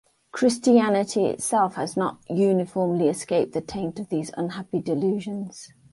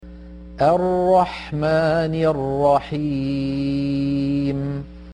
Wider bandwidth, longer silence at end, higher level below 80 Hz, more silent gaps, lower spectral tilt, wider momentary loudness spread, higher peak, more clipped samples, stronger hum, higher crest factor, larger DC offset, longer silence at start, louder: first, 12 kHz vs 10.5 kHz; first, 0.25 s vs 0 s; second, -62 dBFS vs -42 dBFS; neither; second, -5.5 dB/octave vs -8 dB/octave; first, 12 LU vs 9 LU; about the same, -6 dBFS vs -6 dBFS; neither; neither; about the same, 18 dB vs 14 dB; neither; first, 0.35 s vs 0 s; second, -24 LUFS vs -20 LUFS